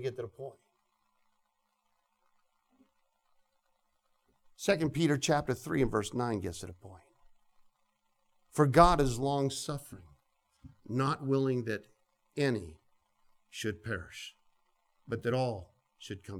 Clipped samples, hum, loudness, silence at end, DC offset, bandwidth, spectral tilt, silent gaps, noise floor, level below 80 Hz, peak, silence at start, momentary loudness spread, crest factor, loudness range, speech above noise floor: under 0.1%; none; -31 LUFS; 0 s; under 0.1%; 16.5 kHz; -5.5 dB/octave; none; -78 dBFS; -50 dBFS; -8 dBFS; 0 s; 19 LU; 26 dB; 9 LU; 47 dB